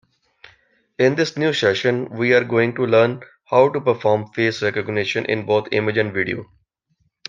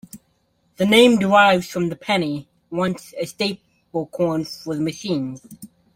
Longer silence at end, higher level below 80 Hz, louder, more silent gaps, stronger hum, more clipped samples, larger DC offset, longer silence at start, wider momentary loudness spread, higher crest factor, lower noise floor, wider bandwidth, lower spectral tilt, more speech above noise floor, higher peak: first, 0.85 s vs 0.3 s; second, -64 dBFS vs -58 dBFS; about the same, -19 LUFS vs -20 LUFS; neither; neither; neither; neither; first, 1 s vs 0.15 s; second, 6 LU vs 17 LU; about the same, 18 dB vs 20 dB; about the same, -67 dBFS vs -65 dBFS; second, 7.6 kHz vs 16.5 kHz; about the same, -6 dB/octave vs -5 dB/octave; first, 49 dB vs 45 dB; about the same, -2 dBFS vs 0 dBFS